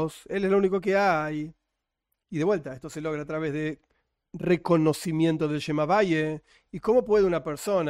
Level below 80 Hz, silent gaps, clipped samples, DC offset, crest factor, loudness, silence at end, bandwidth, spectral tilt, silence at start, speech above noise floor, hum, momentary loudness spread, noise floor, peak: -58 dBFS; none; under 0.1%; under 0.1%; 16 dB; -26 LUFS; 0 s; 16 kHz; -6.5 dB/octave; 0 s; 57 dB; none; 13 LU; -83 dBFS; -10 dBFS